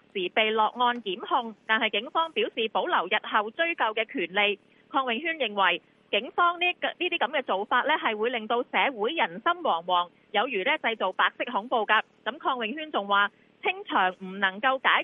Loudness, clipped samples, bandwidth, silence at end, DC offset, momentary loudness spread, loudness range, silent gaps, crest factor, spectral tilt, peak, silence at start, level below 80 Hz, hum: -26 LUFS; under 0.1%; 4.7 kHz; 0 s; under 0.1%; 5 LU; 1 LU; none; 20 dB; -6 dB/octave; -6 dBFS; 0.15 s; -82 dBFS; none